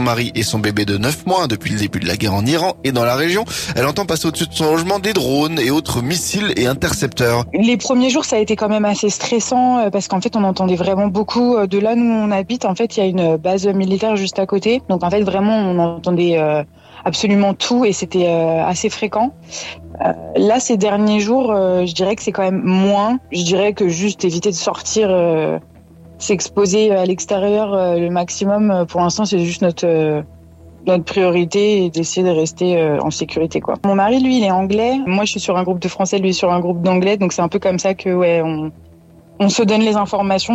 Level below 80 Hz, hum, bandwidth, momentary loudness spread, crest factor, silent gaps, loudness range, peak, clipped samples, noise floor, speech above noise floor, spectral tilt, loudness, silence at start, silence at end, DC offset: -46 dBFS; none; 16 kHz; 5 LU; 12 dB; none; 1 LU; -4 dBFS; under 0.1%; -44 dBFS; 28 dB; -5 dB/octave; -16 LUFS; 0 s; 0 s; under 0.1%